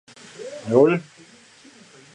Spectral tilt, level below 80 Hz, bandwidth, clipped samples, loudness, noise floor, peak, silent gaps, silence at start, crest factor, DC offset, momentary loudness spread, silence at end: -7 dB/octave; -70 dBFS; 10.5 kHz; under 0.1%; -19 LUFS; -50 dBFS; -4 dBFS; none; 0.4 s; 20 dB; under 0.1%; 22 LU; 1.1 s